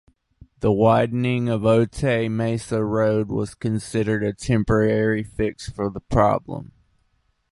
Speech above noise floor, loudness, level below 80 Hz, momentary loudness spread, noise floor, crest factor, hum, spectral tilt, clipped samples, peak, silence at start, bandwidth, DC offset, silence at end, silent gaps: 46 dB; -22 LUFS; -42 dBFS; 8 LU; -67 dBFS; 18 dB; none; -7 dB/octave; under 0.1%; -2 dBFS; 0.6 s; 11.5 kHz; under 0.1%; 0.9 s; none